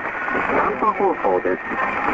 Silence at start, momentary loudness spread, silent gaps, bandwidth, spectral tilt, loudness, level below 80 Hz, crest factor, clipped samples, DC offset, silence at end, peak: 0 s; 4 LU; none; 7.8 kHz; -7 dB/octave; -20 LUFS; -50 dBFS; 14 dB; under 0.1%; under 0.1%; 0 s; -6 dBFS